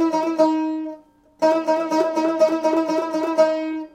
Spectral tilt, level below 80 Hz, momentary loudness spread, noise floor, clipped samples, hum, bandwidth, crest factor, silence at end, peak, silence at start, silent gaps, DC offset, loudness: -4.5 dB/octave; -66 dBFS; 6 LU; -45 dBFS; under 0.1%; none; 10 kHz; 14 dB; 0.05 s; -6 dBFS; 0 s; none; under 0.1%; -20 LUFS